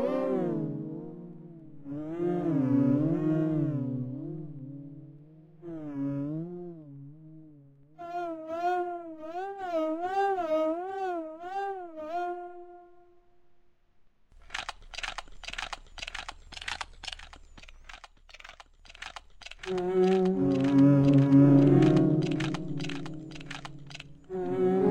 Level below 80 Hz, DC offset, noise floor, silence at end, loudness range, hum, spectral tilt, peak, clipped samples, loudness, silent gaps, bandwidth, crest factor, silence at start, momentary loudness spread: -56 dBFS; under 0.1%; -64 dBFS; 0 s; 18 LU; none; -7.5 dB/octave; -10 dBFS; under 0.1%; -28 LUFS; none; 9.6 kHz; 20 dB; 0 s; 24 LU